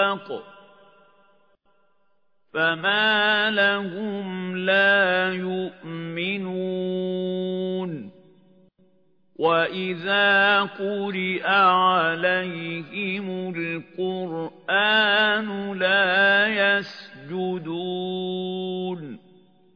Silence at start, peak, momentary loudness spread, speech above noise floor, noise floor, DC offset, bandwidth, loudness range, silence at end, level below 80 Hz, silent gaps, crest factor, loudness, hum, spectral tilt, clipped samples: 0 s; -6 dBFS; 14 LU; 49 dB; -72 dBFS; under 0.1%; 5.4 kHz; 7 LU; 0.6 s; -76 dBFS; none; 18 dB; -22 LUFS; none; -6.5 dB/octave; under 0.1%